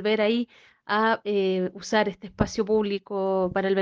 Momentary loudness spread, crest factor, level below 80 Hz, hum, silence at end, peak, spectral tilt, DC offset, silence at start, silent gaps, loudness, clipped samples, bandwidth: 6 LU; 20 dB; -50 dBFS; none; 0 s; -4 dBFS; -5.5 dB/octave; under 0.1%; 0 s; none; -25 LUFS; under 0.1%; 7.6 kHz